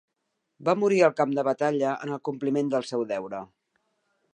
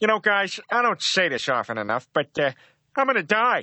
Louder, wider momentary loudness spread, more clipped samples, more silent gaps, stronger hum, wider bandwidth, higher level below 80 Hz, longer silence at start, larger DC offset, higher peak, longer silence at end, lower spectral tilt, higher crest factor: second, -26 LUFS vs -23 LUFS; first, 11 LU vs 6 LU; neither; neither; neither; first, 9.8 kHz vs 8.4 kHz; second, -78 dBFS vs -72 dBFS; first, 0.6 s vs 0 s; neither; about the same, -6 dBFS vs -4 dBFS; first, 0.9 s vs 0 s; first, -6 dB/octave vs -3 dB/octave; about the same, 20 dB vs 18 dB